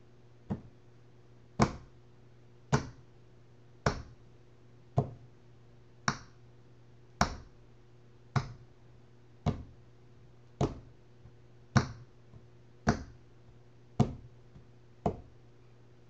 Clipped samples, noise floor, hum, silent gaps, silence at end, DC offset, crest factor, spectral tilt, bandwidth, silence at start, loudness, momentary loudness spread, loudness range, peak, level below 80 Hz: under 0.1%; -59 dBFS; none; none; 0.9 s; 0.1%; 30 dB; -6 dB/octave; 8.4 kHz; 0.5 s; -36 LUFS; 26 LU; 4 LU; -8 dBFS; -52 dBFS